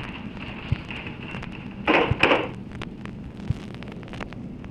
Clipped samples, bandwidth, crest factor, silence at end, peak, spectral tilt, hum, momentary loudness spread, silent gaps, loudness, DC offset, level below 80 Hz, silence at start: under 0.1%; 11.5 kHz; 26 dB; 0 s; -2 dBFS; -6.5 dB/octave; none; 17 LU; none; -27 LUFS; under 0.1%; -44 dBFS; 0 s